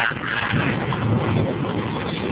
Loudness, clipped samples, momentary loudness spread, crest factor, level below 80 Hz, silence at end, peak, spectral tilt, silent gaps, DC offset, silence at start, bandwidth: -22 LUFS; under 0.1%; 4 LU; 16 dB; -42 dBFS; 0 s; -6 dBFS; -10.5 dB/octave; none; under 0.1%; 0 s; 4 kHz